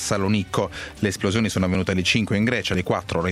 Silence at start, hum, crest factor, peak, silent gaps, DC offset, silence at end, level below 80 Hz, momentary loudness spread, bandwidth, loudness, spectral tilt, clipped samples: 0 s; none; 18 dB; -4 dBFS; none; under 0.1%; 0 s; -46 dBFS; 6 LU; 14.5 kHz; -22 LUFS; -5 dB/octave; under 0.1%